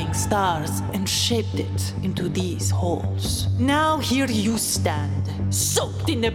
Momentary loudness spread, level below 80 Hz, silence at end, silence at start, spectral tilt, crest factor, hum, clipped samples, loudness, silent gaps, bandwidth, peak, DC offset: 5 LU; -42 dBFS; 0 s; 0 s; -4.5 dB/octave; 16 dB; none; under 0.1%; -23 LUFS; none; 17.5 kHz; -6 dBFS; under 0.1%